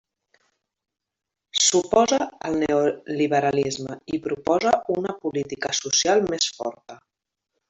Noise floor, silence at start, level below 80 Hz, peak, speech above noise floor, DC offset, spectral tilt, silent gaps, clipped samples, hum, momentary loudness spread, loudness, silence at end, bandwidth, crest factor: -80 dBFS; 1.55 s; -60 dBFS; -4 dBFS; 57 dB; under 0.1%; -2.5 dB/octave; none; under 0.1%; none; 10 LU; -22 LUFS; 0.75 s; 8.2 kHz; 20 dB